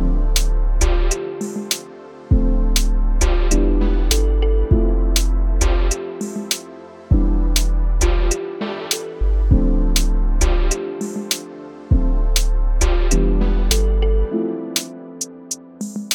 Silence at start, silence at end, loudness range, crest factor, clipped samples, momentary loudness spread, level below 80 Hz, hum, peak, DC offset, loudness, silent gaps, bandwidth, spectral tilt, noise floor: 0 s; 0 s; 2 LU; 16 dB; under 0.1%; 9 LU; -18 dBFS; none; -2 dBFS; under 0.1%; -20 LUFS; none; 19 kHz; -4.5 dB/octave; -37 dBFS